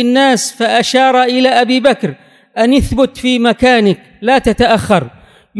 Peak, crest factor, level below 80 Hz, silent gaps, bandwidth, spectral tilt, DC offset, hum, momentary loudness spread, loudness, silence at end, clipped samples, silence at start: 0 dBFS; 12 dB; -32 dBFS; none; 11 kHz; -4.5 dB/octave; under 0.1%; none; 6 LU; -11 LUFS; 0 s; 0.3%; 0 s